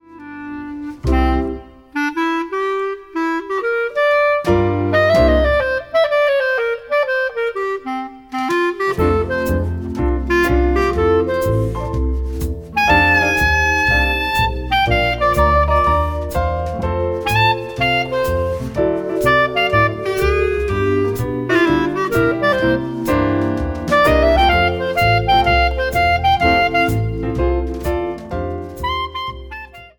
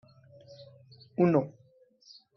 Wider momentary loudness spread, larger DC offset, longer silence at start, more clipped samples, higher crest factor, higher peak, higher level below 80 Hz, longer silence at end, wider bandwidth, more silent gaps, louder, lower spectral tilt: second, 10 LU vs 26 LU; neither; second, 0.1 s vs 0.6 s; neither; second, 16 dB vs 22 dB; first, 0 dBFS vs -12 dBFS; first, -26 dBFS vs -74 dBFS; second, 0.1 s vs 0.85 s; first, 19 kHz vs 6.2 kHz; neither; first, -17 LUFS vs -28 LUFS; second, -6 dB/octave vs -8 dB/octave